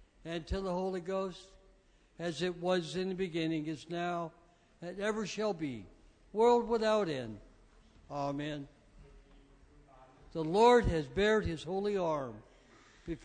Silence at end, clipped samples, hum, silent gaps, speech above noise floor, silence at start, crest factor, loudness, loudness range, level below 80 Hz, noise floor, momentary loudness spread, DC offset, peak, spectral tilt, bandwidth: 0 s; under 0.1%; none; none; 32 dB; 0.25 s; 22 dB; -33 LUFS; 6 LU; -52 dBFS; -65 dBFS; 17 LU; under 0.1%; -14 dBFS; -5.5 dB/octave; 9.6 kHz